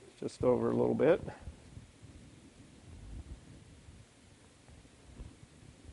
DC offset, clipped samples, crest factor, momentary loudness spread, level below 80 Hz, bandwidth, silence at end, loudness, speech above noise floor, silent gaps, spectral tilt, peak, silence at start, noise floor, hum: under 0.1%; under 0.1%; 22 dB; 27 LU; -56 dBFS; 11.5 kHz; 0 s; -31 LUFS; 30 dB; none; -7.5 dB/octave; -16 dBFS; 0.2 s; -60 dBFS; none